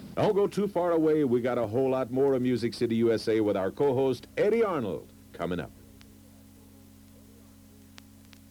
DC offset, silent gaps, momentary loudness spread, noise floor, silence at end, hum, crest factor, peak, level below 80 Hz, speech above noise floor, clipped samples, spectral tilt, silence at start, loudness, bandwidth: under 0.1%; none; 10 LU; -53 dBFS; 2.8 s; none; 14 dB; -14 dBFS; -62 dBFS; 27 dB; under 0.1%; -7 dB/octave; 0 s; -27 LUFS; 19 kHz